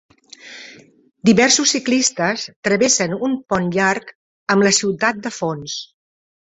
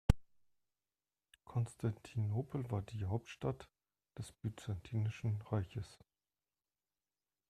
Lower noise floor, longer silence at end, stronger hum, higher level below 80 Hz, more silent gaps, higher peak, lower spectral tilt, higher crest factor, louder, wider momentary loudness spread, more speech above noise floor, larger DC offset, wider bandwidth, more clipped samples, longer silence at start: second, -43 dBFS vs under -90 dBFS; second, 0.6 s vs 1.55 s; neither; about the same, -56 dBFS vs -52 dBFS; first, 2.56-2.63 s, 4.15-4.46 s vs none; first, -2 dBFS vs -12 dBFS; second, -3 dB/octave vs -7.5 dB/octave; second, 18 dB vs 30 dB; first, -17 LUFS vs -42 LUFS; first, 15 LU vs 12 LU; second, 26 dB vs over 50 dB; neither; second, 8.4 kHz vs 12.5 kHz; neither; first, 0.45 s vs 0.1 s